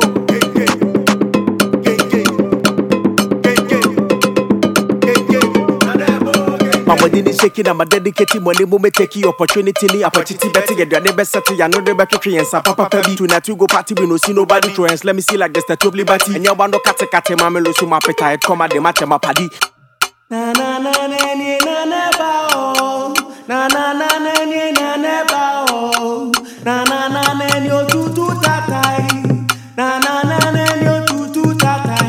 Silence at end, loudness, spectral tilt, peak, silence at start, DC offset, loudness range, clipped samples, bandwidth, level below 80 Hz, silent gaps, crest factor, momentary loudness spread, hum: 0 s; -14 LUFS; -4 dB/octave; 0 dBFS; 0 s; under 0.1%; 3 LU; 0.1%; 19 kHz; -52 dBFS; none; 14 dB; 4 LU; none